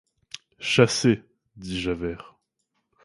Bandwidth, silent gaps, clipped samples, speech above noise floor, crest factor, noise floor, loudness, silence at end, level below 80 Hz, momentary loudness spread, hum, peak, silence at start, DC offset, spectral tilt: 11.5 kHz; none; under 0.1%; 53 dB; 24 dB; -76 dBFS; -24 LUFS; 0.85 s; -52 dBFS; 22 LU; none; -2 dBFS; 0.6 s; under 0.1%; -4.5 dB/octave